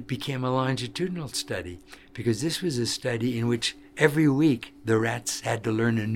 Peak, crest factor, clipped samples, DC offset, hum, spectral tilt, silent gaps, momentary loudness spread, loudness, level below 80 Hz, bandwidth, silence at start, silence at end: -4 dBFS; 22 dB; under 0.1%; under 0.1%; none; -5 dB/octave; none; 10 LU; -26 LUFS; -58 dBFS; 17 kHz; 0 s; 0 s